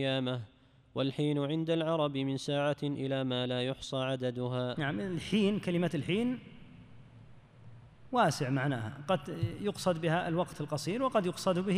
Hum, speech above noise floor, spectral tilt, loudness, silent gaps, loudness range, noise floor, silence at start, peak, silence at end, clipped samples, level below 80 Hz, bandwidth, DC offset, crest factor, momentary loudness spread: none; 23 dB; -6 dB/octave; -33 LUFS; none; 2 LU; -55 dBFS; 0 s; -16 dBFS; 0 s; under 0.1%; -64 dBFS; 15.5 kHz; under 0.1%; 18 dB; 6 LU